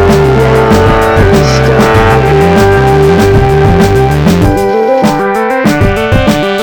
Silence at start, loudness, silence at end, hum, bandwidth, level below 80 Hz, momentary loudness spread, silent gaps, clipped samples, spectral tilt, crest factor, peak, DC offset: 0 s; -7 LUFS; 0 s; none; 19.5 kHz; -18 dBFS; 3 LU; none; under 0.1%; -6.5 dB/octave; 6 dB; 0 dBFS; 0.6%